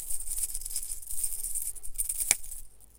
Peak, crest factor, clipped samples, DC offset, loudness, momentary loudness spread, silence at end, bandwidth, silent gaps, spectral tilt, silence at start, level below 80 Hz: -2 dBFS; 30 dB; under 0.1%; under 0.1%; -31 LUFS; 8 LU; 0.1 s; 17 kHz; none; 1 dB/octave; 0 s; -44 dBFS